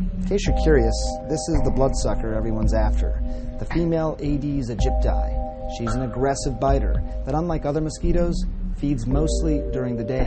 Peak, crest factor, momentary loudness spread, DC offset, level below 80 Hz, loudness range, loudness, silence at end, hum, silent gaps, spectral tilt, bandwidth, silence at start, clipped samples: -6 dBFS; 16 dB; 7 LU; under 0.1%; -24 dBFS; 2 LU; -24 LUFS; 0 s; none; none; -6.5 dB/octave; 8.8 kHz; 0 s; under 0.1%